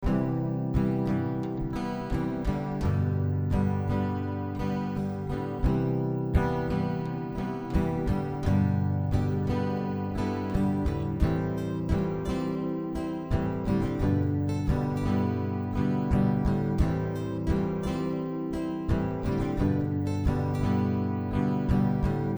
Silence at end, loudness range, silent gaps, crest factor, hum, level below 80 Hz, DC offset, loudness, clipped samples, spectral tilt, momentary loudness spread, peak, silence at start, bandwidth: 0 s; 2 LU; none; 18 dB; none; -36 dBFS; under 0.1%; -29 LUFS; under 0.1%; -9 dB/octave; 5 LU; -10 dBFS; 0 s; over 20 kHz